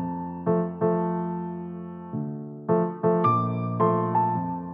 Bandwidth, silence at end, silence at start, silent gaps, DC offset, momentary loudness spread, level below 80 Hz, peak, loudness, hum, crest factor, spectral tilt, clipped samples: 3.8 kHz; 0 s; 0 s; none; under 0.1%; 12 LU; -64 dBFS; -10 dBFS; -26 LUFS; none; 16 dB; -12 dB/octave; under 0.1%